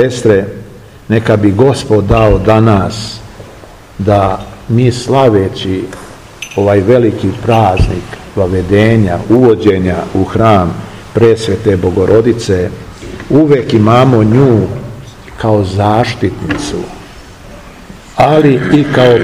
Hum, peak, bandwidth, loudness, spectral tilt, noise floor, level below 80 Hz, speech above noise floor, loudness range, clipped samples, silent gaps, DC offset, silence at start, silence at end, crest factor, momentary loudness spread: none; 0 dBFS; 12.5 kHz; -10 LUFS; -7 dB/octave; -33 dBFS; -28 dBFS; 24 dB; 3 LU; 2%; none; under 0.1%; 0 s; 0 s; 10 dB; 16 LU